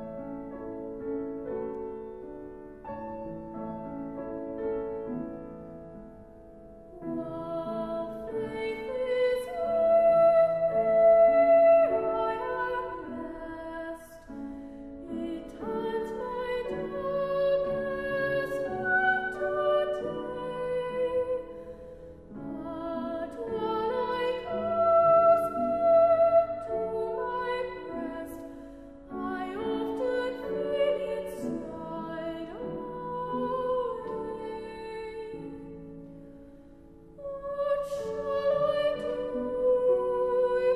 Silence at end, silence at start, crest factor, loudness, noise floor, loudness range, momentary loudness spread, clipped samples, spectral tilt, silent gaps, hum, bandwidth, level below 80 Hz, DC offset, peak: 0 s; 0 s; 16 dB; -29 LUFS; -52 dBFS; 14 LU; 20 LU; under 0.1%; -6.5 dB/octave; none; none; 12.5 kHz; -56 dBFS; 0.1%; -12 dBFS